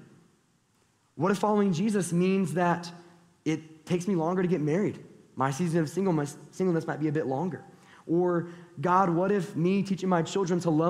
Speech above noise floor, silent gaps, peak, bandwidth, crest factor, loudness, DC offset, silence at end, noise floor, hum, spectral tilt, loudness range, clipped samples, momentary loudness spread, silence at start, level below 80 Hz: 41 dB; none; -10 dBFS; 13.5 kHz; 18 dB; -28 LUFS; under 0.1%; 0 s; -68 dBFS; none; -7 dB/octave; 2 LU; under 0.1%; 9 LU; 1.15 s; -68 dBFS